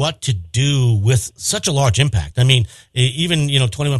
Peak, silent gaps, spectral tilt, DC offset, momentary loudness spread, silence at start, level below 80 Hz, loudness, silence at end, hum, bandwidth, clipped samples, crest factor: 0 dBFS; none; -4.5 dB/octave; under 0.1%; 5 LU; 0 s; -40 dBFS; -17 LUFS; 0 s; none; 12.5 kHz; under 0.1%; 16 dB